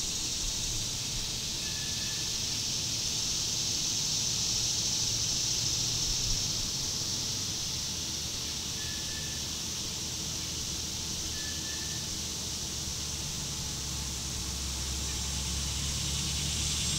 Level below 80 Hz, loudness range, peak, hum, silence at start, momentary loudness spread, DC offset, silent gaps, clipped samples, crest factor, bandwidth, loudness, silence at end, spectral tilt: -44 dBFS; 5 LU; -16 dBFS; none; 0 s; 6 LU; under 0.1%; none; under 0.1%; 16 dB; 16 kHz; -30 LUFS; 0 s; -1.5 dB/octave